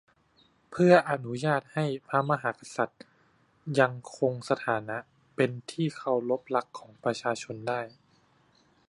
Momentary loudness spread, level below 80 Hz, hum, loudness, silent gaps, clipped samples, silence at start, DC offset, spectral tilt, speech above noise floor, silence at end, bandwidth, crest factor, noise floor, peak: 11 LU; -74 dBFS; none; -29 LUFS; none; under 0.1%; 0.7 s; under 0.1%; -6 dB/octave; 37 dB; 1 s; 11.5 kHz; 24 dB; -66 dBFS; -6 dBFS